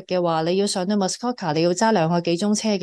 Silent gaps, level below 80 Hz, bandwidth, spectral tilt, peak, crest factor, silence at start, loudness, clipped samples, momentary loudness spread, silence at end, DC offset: none; -66 dBFS; 12.5 kHz; -5 dB/octave; -8 dBFS; 12 dB; 0 s; -21 LUFS; under 0.1%; 5 LU; 0 s; under 0.1%